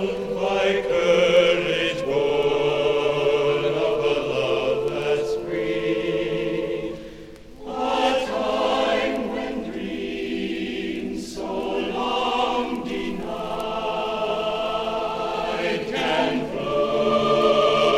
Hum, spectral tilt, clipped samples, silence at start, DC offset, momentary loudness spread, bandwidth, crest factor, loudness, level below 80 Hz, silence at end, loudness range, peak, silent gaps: none; -5 dB/octave; under 0.1%; 0 s; under 0.1%; 10 LU; 13.5 kHz; 16 dB; -23 LUFS; -48 dBFS; 0 s; 6 LU; -6 dBFS; none